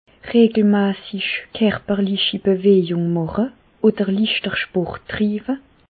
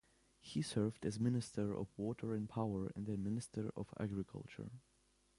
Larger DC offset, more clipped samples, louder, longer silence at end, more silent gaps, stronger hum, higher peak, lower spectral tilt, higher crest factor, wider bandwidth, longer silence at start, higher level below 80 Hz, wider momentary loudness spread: neither; neither; first, -19 LUFS vs -43 LUFS; second, 0.35 s vs 0.6 s; neither; neither; first, -4 dBFS vs -24 dBFS; first, -11 dB/octave vs -7 dB/octave; about the same, 16 dB vs 18 dB; second, 4.7 kHz vs 11.5 kHz; second, 0.25 s vs 0.45 s; first, -50 dBFS vs -66 dBFS; second, 9 LU vs 12 LU